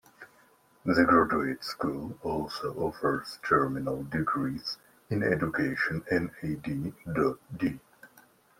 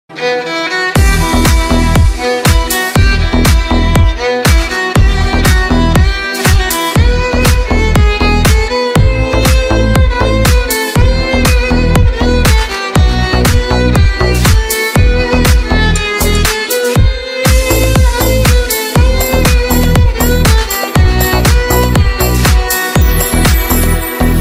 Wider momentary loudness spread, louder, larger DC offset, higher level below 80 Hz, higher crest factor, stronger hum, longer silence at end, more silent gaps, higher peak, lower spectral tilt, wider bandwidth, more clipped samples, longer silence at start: first, 11 LU vs 2 LU; second, -30 LUFS vs -10 LUFS; neither; second, -58 dBFS vs -12 dBFS; first, 22 dB vs 8 dB; neither; first, 0.55 s vs 0 s; neither; second, -8 dBFS vs 0 dBFS; first, -6.5 dB/octave vs -4.5 dB/octave; about the same, 16 kHz vs 16.5 kHz; second, under 0.1% vs 0.3%; about the same, 0.2 s vs 0.1 s